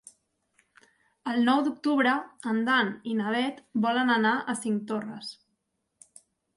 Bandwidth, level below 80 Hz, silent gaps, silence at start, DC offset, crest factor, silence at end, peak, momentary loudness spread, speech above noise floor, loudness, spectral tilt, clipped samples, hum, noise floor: 11.5 kHz; -78 dBFS; none; 1.25 s; under 0.1%; 18 dB; 1.25 s; -12 dBFS; 10 LU; 52 dB; -27 LUFS; -4.5 dB/octave; under 0.1%; none; -79 dBFS